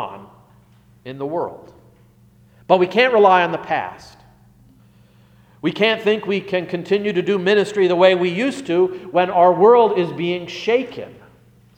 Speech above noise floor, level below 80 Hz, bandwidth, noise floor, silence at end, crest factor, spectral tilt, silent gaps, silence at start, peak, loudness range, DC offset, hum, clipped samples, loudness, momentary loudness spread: 34 dB; -62 dBFS; 9.6 kHz; -51 dBFS; 0.65 s; 18 dB; -6 dB/octave; none; 0 s; 0 dBFS; 7 LU; under 0.1%; 60 Hz at -50 dBFS; under 0.1%; -17 LUFS; 14 LU